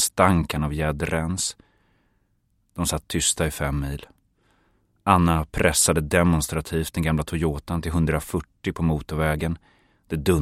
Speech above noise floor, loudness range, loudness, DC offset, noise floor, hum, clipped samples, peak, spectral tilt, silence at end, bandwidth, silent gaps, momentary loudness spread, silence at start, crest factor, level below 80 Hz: 45 dB; 5 LU; -23 LUFS; under 0.1%; -68 dBFS; none; under 0.1%; -2 dBFS; -4.5 dB/octave; 0 s; 16 kHz; none; 11 LU; 0 s; 22 dB; -36 dBFS